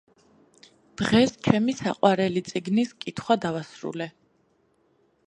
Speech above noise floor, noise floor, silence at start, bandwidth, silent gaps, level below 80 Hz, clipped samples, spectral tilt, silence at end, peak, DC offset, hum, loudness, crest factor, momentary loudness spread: 42 dB; -66 dBFS; 1 s; 11 kHz; none; -58 dBFS; under 0.1%; -5.5 dB/octave; 1.2 s; -2 dBFS; under 0.1%; none; -25 LUFS; 24 dB; 14 LU